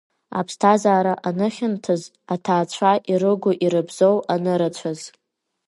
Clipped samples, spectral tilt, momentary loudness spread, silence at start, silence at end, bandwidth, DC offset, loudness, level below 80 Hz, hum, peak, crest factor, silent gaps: under 0.1%; -6 dB/octave; 12 LU; 0.3 s; 0.6 s; 11.5 kHz; under 0.1%; -20 LUFS; -70 dBFS; none; -2 dBFS; 18 dB; none